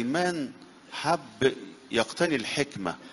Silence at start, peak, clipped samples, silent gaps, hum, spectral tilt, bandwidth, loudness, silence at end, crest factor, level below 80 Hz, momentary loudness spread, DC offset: 0 s; -8 dBFS; under 0.1%; none; none; -4 dB/octave; 11.5 kHz; -29 LUFS; 0 s; 22 dB; -64 dBFS; 10 LU; under 0.1%